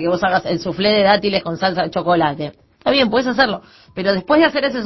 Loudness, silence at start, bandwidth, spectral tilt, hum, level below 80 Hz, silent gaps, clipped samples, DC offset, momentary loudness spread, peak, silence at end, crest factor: -17 LUFS; 0 s; 6.2 kHz; -6 dB/octave; none; -48 dBFS; none; under 0.1%; under 0.1%; 9 LU; 0 dBFS; 0 s; 16 dB